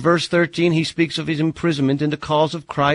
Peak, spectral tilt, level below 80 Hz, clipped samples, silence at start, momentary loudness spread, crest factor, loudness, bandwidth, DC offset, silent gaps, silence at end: -4 dBFS; -6 dB/octave; -52 dBFS; under 0.1%; 0 s; 4 LU; 16 dB; -19 LUFS; 11 kHz; under 0.1%; none; 0 s